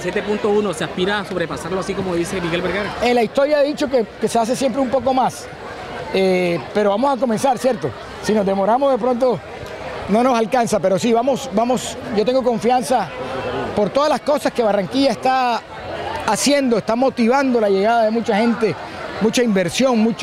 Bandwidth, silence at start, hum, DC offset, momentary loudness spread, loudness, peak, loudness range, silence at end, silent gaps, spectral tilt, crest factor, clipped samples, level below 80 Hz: 15.5 kHz; 0 s; none; under 0.1%; 8 LU; -18 LUFS; -4 dBFS; 2 LU; 0 s; none; -5 dB/octave; 14 dB; under 0.1%; -48 dBFS